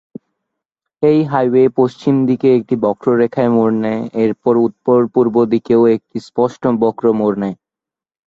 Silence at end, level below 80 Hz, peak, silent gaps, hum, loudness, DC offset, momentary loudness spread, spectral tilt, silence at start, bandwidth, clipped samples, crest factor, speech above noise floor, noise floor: 0.75 s; -58 dBFS; -2 dBFS; none; none; -15 LUFS; under 0.1%; 6 LU; -9 dB/octave; 1 s; 7.6 kHz; under 0.1%; 14 dB; 74 dB; -88 dBFS